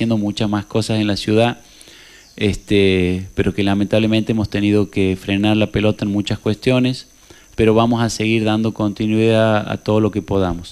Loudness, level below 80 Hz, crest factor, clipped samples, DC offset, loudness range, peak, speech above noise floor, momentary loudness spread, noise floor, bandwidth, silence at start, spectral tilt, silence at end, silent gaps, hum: -17 LUFS; -40 dBFS; 14 dB; under 0.1%; under 0.1%; 2 LU; -2 dBFS; 27 dB; 6 LU; -43 dBFS; 13 kHz; 0 s; -6.5 dB/octave; 0 s; none; none